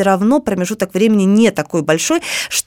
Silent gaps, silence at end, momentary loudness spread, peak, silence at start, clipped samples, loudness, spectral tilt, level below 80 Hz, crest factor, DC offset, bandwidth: none; 0.05 s; 7 LU; 0 dBFS; 0 s; under 0.1%; -14 LUFS; -4.5 dB/octave; -52 dBFS; 14 dB; under 0.1%; 17 kHz